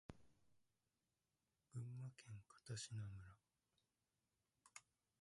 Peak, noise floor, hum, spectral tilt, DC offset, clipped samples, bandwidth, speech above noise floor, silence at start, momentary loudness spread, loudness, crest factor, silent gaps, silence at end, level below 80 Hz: -38 dBFS; under -90 dBFS; none; -4.5 dB/octave; under 0.1%; under 0.1%; 11 kHz; over 36 dB; 0.1 s; 13 LU; -56 LUFS; 20 dB; none; 0.4 s; -78 dBFS